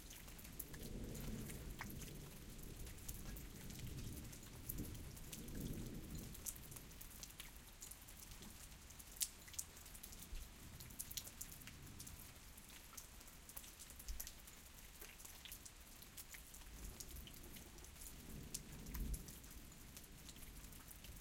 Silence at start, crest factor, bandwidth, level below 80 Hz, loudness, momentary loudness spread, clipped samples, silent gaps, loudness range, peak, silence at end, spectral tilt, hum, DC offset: 0 s; 32 dB; 17 kHz; -58 dBFS; -53 LUFS; 8 LU; under 0.1%; none; 5 LU; -20 dBFS; 0 s; -3 dB/octave; none; under 0.1%